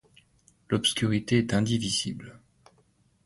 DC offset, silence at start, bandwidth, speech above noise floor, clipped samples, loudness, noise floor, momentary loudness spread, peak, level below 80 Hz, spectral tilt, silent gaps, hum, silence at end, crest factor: under 0.1%; 0.7 s; 11.5 kHz; 39 dB; under 0.1%; -26 LUFS; -66 dBFS; 12 LU; -10 dBFS; -56 dBFS; -4.5 dB/octave; none; none; 0.9 s; 20 dB